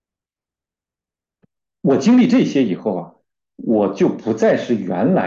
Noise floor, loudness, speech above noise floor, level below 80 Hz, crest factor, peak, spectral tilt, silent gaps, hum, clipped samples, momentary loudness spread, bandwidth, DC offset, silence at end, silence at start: -90 dBFS; -17 LUFS; 74 dB; -64 dBFS; 14 dB; -4 dBFS; -7 dB/octave; none; none; under 0.1%; 10 LU; 7.4 kHz; under 0.1%; 0 s; 1.85 s